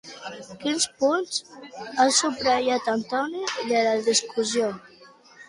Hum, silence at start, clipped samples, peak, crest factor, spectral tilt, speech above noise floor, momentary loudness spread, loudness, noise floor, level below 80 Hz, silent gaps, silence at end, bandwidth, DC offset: none; 0.05 s; under 0.1%; -6 dBFS; 20 dB; -1.5 dB/octave; 27 dB; 18 LU; -24 LUFS; -51 dBFS; -66 dBFS; none; 0.05 s; 11.5 kHz; under 0.1%